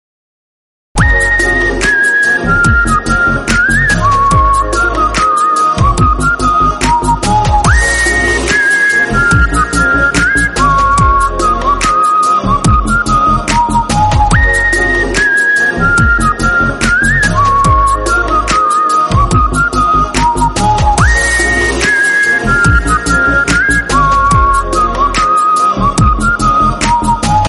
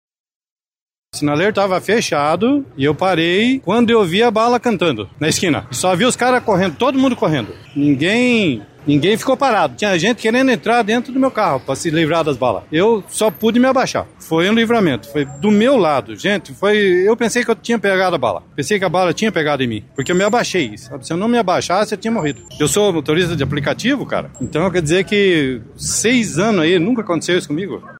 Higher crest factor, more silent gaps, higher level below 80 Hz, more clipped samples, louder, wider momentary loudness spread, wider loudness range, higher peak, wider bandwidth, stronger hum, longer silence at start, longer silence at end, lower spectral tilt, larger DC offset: about the same, 10 dB vs 12 dB; neither; first, -18 dBFS vs -48 dBFS; neither; first, -9 LUFS vs -16 LUFS; second, 3 LU vs 7 LU; about the same, 1 LU vs 2 LU; first, 0 dBFS vs -4 dBFS; second, 11.5 kHz vs 16 kHz; neither; second, 0.95 s vs 1.15 s; about the same, 0 s vs 0 s; about the same, -4.5 dB/octave vs -4.5 dB/octave; neither